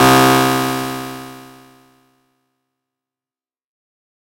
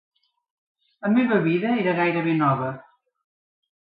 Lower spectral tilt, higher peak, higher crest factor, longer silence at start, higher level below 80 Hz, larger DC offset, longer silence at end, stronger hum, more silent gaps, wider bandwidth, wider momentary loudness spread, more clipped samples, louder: second, -4 dB/octave vs -11.5 dB/octave; first, 0 dBFS vs -8 dBFS; about the same, 18 dB vs 16 dB; second, 0 s vs 1 s; first, -48 dBFS vs -70 dBFS; neither; first, 2.85 s vs 1.05 s; neither; neither; first, 16.5 kHz vs 5 kHz; first, 22 LU vs 11 LU; neither; first, -14 LUFS vs -22 LUFS